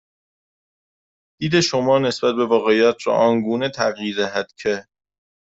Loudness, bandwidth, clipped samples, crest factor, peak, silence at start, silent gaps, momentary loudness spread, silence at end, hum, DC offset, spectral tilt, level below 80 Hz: -19 LUFS; 8 kHz; under 0.1%; 18 dB; -4 dBFS; 1.4 s; none; 8 LU; 0.7 s; none; under 0.1%; -4.5 dB/octave; -60 dBFS